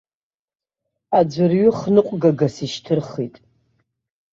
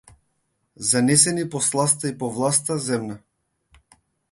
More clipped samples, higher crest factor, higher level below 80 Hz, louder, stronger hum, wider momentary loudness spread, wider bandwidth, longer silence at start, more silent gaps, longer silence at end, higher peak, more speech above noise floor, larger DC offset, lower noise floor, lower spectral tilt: neither; second, 18 dB vs 24 dB; about the same, -60 dBFS vs -62 dBFS; about the same, -19 LUFS vs -20 LUFS; neither; about the same, 13 LU vs 11 LU; second, 7.8 kHz vs 11.5 kHz; first, 1.1 s vs 0.8 s; neither; about the same, 1.05 s vs 1.15 s; about the same, -2 dBFS vs 0 dBFS; first, over 72 dB vs 50 dB; neither; first, under -90 dBFS vs -72 dBFS; first, -7.5 dB/octave vs -3.5 dB/octave